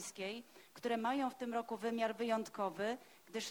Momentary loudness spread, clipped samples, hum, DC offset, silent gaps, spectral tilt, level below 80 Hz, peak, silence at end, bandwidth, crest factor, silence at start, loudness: 11 LU; under 0.1%; none; under 0.1%; none; -3.5 dB/octave; -84 dBFS; -24 dBFS; 0 s; over 20 kHz; 16 dB; 0 s; -40 LUFS